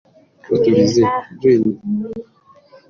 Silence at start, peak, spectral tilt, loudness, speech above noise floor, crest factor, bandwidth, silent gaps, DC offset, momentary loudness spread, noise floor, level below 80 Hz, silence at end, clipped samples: 0.5 s; -2 dBFS; -6.5 dB/octave; -16 LUFS; 32 dB; 14 dB; 7.4 kHz; none; under 0.1%; 11 LU; -47 dBFS; -54 dBFS; 0.7 s; under 0.1%